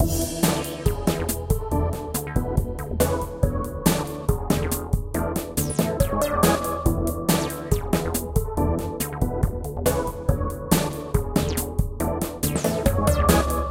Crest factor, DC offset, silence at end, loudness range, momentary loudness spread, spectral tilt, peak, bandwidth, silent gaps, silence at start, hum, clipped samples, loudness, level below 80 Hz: 20 dB; under 0.1%; 0 s; 2 LU; 6 LU; -5.5 dB/octave; -4 dBFS; 16.5 kHz; none; 0 s; none; under 0.1%; -24 LUFS; -30 dBFS